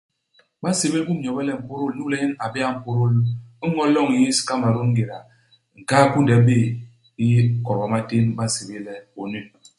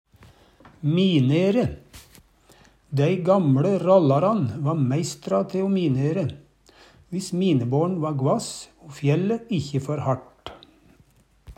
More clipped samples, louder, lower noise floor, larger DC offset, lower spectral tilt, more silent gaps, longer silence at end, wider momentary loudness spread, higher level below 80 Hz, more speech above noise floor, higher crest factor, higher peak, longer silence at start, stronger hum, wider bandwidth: neither; about the same, -21 LUFS vs -23 LUFS; first, -62 dBFS vs -58 dBFS; neither; about the same, -6 dB/octave vs -7 dB/octave; neither; first, 0.3 s vs 0.05 s; first, 15 LU vs 12 LU; about the same, -56 dBFS vs -56 dBFS; first, 42 dB vs 37 dB; about the same, 18 dB vs 18 dB; about the same, -2 dBFS vs -4 dBFS; about the same, 0.6 s vs 0.65 s; neither; second, 11.5 kHz vs 13.5 kHz